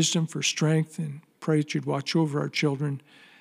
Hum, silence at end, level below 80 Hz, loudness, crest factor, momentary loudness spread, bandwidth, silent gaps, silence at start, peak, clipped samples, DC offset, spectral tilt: none; 0.4 s; -82 dBFS; -27 LUFS; 16 dB; 10 LU; 13.5 kHz; none; 0 s; -10 dBFS; under 0.1%; under 0.1%; -4.5 dB/octave